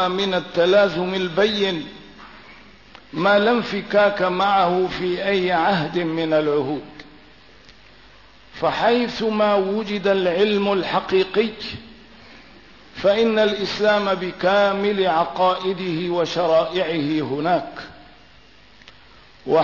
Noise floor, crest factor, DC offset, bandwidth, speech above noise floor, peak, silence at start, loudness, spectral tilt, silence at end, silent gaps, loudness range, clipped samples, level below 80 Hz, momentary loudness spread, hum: -50 dBFS; 14 dB; 0.3%; 6 kHz; 30 dB; -6 dBFS; 0 s; -20 LUFS; -6 dB/octave; 0 s; none; 4 LU; under 0.1%; -56 dBFS; 8 LU; none